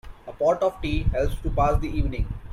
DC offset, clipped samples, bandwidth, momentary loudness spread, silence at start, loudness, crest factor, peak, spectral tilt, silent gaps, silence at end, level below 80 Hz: under 0.1%; under 0.1%; 13 kHz; 6 LU; 0.05 s; -25 LUFS; 16 dB; -8 dBFS; -7.5 dB/octave; none; 0 s; -28 dBFS